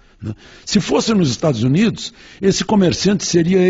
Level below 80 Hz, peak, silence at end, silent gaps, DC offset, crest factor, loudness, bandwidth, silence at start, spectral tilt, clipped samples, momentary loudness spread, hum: -44 dBFS; -2 dBFS; 0 s; none; under 0.1%; 14 dB; -16 LUFS; 8 kHz; 0.2 s; -5.5 dB/octave; under 0.1%; 16 LU; none